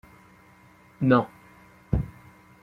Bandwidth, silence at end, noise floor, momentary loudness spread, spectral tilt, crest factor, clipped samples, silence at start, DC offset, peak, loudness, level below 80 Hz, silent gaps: 5.6 kHz; 0.55 s; -55 dBFS; 17 LU; -9 dB/octave; 24 dB; under 0.1%; 1 s; under 0.1%; -6 dBFS; -26 LUFS; -42 dBFS; none